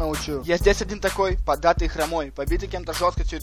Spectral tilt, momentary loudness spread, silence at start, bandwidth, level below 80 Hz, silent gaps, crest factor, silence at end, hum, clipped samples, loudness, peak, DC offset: -4.5 dB/octave; 7 LU; 0 s; 16 kHz; -30 dBFS; none; 18 dB; 0 s; none; under 0.1%; -24 LUFS; -4 dBFS; under 0.1%